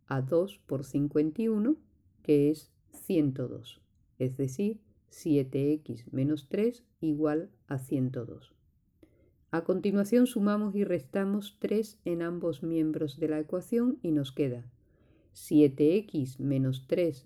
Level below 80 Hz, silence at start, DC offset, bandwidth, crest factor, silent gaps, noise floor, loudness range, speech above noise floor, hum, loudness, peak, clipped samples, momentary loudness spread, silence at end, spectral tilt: -64 dBFS; 0.1 s; under 0.1%; 14.5 kHz; 18 dB; none; -64 dBFS; 4 LU; 35 dB; none; -30 LUFS; -12 dBFS; under 0.1%; 11 LU; 0.05 s; -7.5 dB/octave